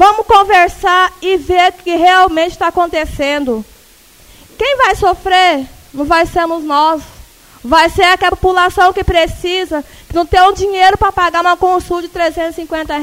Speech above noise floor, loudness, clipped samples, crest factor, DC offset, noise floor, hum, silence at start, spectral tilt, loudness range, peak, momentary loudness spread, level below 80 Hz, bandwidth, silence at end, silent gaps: 31 dB; -11 LUFS; 0.2%; 12 dB; under 0.1%; -43 dBFS; none; 0 s; -4 dB/octave; 3 LU; 0 dBFS; 11 LU; -32 dBFS; 16.5 kHz; 0 s; none